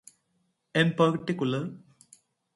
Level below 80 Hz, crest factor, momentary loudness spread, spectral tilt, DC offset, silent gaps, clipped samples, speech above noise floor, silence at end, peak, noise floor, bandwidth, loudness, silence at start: -70 dBFS; 20 dB; 10 LU; -6.5 dB/octave; under 0.1%; none; under 0.1%; 48 dB; 0.75 s; -8 dBFS; -74 dBFS; 11.5 kHz; -27 LUFS; 0.75 s